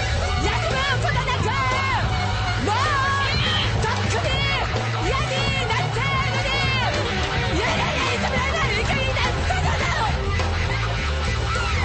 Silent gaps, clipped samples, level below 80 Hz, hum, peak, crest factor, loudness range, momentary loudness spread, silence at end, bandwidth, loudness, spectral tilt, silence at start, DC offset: none; under 0.1%; -30 dBFS; none; -10 dBFS; 12 dB; 1 LU; 3 LU; 0 s; 8.8 kHz; -21 LUFS; -4.5 dB/octave; 0 s; under 0.1%